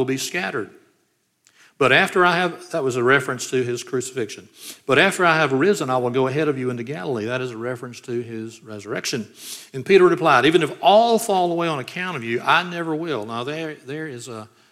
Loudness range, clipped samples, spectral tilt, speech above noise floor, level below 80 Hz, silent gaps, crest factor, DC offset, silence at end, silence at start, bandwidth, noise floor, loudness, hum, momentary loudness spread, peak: 7 LU; under 0.1%; -4.5 dB/octave; 47 dB; -68 dBFS; none; 20 dB; under 0.1%; 0.25 s; 0 s; 15.5 kHz; -67 dBFS; -20 LUFS; none; 17 LU; -2 dBFS